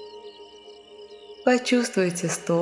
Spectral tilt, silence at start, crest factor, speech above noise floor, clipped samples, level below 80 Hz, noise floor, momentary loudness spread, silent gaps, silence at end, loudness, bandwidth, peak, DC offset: -4.5 dB/octave; 0 s; 20 dB; 24 dB; under 0.1%; -72 dBFS; -47 dBFS; 24 LU; none; 0 s; -23 LUFS; 12 kHz; -6 dBFS; under 0.1%